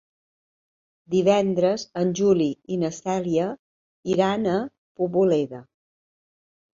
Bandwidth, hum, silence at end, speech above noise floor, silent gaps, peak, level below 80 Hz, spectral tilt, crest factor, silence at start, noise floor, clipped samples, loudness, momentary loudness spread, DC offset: 7.6 kHz; none; 1.15 s; over 68 dB; 3.59-4.03 s, 4.78-4.95 s; -6 dBFS; -64 dBFS; -6.5 dB/octave; 18 dB; 1.1 s; under -90 dBFS; under 0.1%; -23 LUFS; 11 LU; under 0.1%